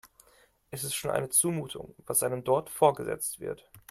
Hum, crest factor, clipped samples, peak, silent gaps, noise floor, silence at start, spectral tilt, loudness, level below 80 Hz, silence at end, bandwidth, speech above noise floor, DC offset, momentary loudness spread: none; 22 dB; under 0.1%; -8 dBFS; none; -63 dBFS; 0.05 s; -3.5 dB/octave; -28 LUFS; -64 dBFS; 0.1 s; 16 kHz; 34 dB; under 0.1%; 16 LU